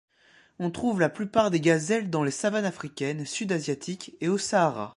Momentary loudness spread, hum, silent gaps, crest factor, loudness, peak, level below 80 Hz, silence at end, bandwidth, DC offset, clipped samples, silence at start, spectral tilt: 9 LU; none; none; 20 dB; -27 LUFS; -8 dBFS; -64 dBFS; 0.05 s; 11.5 kHz; under 0.1%; under 0.1%; 0.6 s; -5 dB/octave